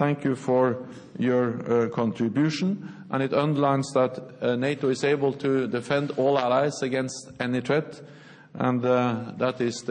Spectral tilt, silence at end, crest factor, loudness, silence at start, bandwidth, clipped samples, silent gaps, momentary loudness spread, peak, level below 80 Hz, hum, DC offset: -6.5 dB/octave; 0 s; 18 dB; -25 LUFS; 0 s; 10 kHz; under 0.1%; none; 7 LU; -8 dBFS; -70 dBFS; none; under 0.1%